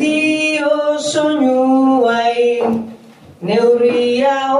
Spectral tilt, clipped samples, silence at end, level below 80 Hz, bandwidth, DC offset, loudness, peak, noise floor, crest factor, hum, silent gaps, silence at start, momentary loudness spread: -4.5 dB/octave; under 0.1%; 0 s; -62 dBFS; 11.5 kHz; under 0.1%; -14 LUFS; -2 dBFS; -39 dBFS; 12 dB; none; none; 0 s; 6 LU